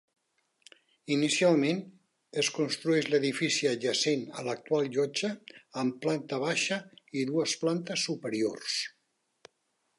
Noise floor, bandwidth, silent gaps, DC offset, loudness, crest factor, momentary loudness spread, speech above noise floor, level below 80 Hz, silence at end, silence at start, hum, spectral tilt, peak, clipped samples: -77 dBFS; 11.5 kHz; none; under 0.1%; -30 LUFS; 18 dB; 10 LU; 48 dB; -82 dBFS; 1.1 s; 1.05 s; none; -3.5 dB/octave; -12 dBFS; under 0.1%